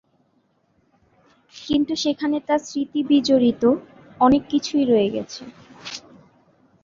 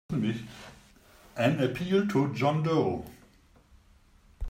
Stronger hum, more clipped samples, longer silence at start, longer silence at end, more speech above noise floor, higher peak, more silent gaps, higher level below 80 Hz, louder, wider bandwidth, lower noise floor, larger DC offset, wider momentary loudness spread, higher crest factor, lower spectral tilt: neither; neither; first, 1.55 s vs 0.1 s; first, 0.85 s vs 0 s; first, 45 dB vs 32 dB; first, -4 dBFS vs -12 dBFS; neither; about the same, -54 dBFS vs -50 dBFS; first, -20 LUFS vs -28 LUFS; second, 7.6 kHz vs 16 kHz; first, -65 dBFS vs -59 dBFS; neither; about the same, 19 LU vs 20 LU; about the same, 18 dB vs 18 dB; second, -5 dB/octave vs -7 dB/octave